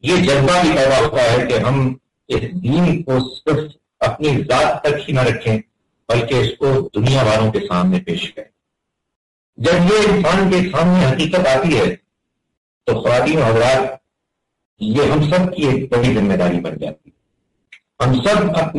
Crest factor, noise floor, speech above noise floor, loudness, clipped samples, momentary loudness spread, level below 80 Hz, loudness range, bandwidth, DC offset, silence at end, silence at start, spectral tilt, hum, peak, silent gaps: 10 dB; -76 dBFS; 61 dB; -16 LUFS; under 0.1%; 9 LU; -40 dBFS; 3 LU; 11.5 kHz; under 0.1%; 0 s; 0.05 s; -6 dB/octave; none; -6 dBFS; 9.16-9.53 s, 12.57-12.81 s, 14.65-14.77 s